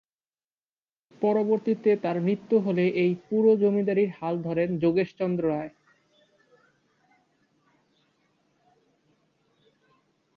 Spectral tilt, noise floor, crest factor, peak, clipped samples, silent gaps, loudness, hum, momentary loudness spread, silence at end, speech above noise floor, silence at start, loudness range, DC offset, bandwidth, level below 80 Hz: -9.5 dB/octave; under -90 dBFS; 16 dB; -10 dBFS; under 0.1%; none; -25 LUFS; none; 6 LU; 4.65 s; over 66 dB; 1.2 s; 9 LU; under 0.1%; 6 kHz; -68 dBFS